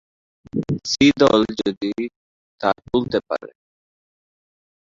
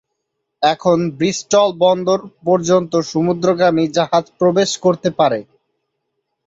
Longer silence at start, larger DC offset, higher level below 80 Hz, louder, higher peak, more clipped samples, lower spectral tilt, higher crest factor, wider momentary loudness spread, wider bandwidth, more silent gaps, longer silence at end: about the same, 0.55 s vs 0.6 s; neither; first, -52 dBFS vs -58 dBFS; second, -20 LUFS vs -16 LUFS; about the same, -2 dBFS vs -2 dBFS; neither; about the same, -5 dB/octave vs -5 dB/octave; about the same, 20 dB vs 16 dB; first, 14 LU vs 4 LU; about the same, 7.6 kHz vs 8 kHz; first, 1.77-1.81 s, 2.16-2.58 s vs none; first, 1.4 s vs 1.05 s